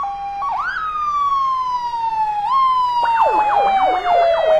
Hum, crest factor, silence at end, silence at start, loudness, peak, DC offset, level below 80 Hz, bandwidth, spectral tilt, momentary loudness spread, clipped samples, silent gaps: none; 12 dB; 0 s; 0 s; -17 LUFS; -6 dBFS; under 0.1%; -48 dBFS; 11.5 kHz; -3.5 dB/octave; 6 LU; under 0.1%; none